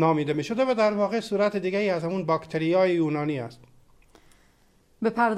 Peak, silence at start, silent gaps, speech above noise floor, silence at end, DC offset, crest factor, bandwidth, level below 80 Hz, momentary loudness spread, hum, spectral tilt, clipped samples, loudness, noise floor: -10 dBFS; 0 s; none; 37 dB; 0 s; under 0.1%; 16 dB; 12.5 kHz; -64 dBFS; 7 LU; none; -7 dB/octave; under 0.1%; -25 LUFS; -61 dBFS